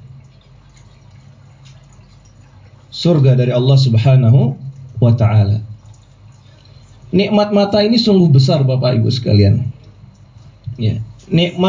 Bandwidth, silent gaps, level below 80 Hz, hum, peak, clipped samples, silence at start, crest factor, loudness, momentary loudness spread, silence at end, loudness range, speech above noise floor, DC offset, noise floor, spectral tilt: 7.6 kHz; none; -40 dBFS; none; -2 dBFS; under 0.1%; 0.05 s; 12 dB; -13 LUFS; 15 LU; 0 s; 4 LU; 32 dB; under 0.1%; -44 dBFS; -8 dB/octave